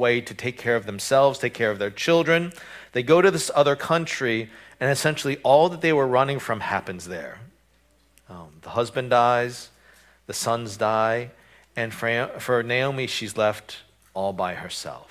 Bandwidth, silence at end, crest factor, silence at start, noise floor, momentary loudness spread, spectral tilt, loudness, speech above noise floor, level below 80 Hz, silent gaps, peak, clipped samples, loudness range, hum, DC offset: 16 kHz; 0.05 s; 20 dB; 0 s; -62 dBFS; 15 LU; -4.5 dB/octave; -23 LUFS; 39 dB; -60 dBFS; none; -4 dBFS; under 0.1%; 6 LU; none; under 0.1%